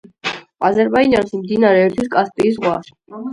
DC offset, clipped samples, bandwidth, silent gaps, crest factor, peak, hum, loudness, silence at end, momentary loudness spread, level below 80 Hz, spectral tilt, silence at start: under 0.1%; under 0.1%; 11.5 kHz; none; 16 dB; 0 dBFS; none; -16 LUFS; 0 s; 12 LU; -50 dBFS; -6.5 dB/octave; 0.25 s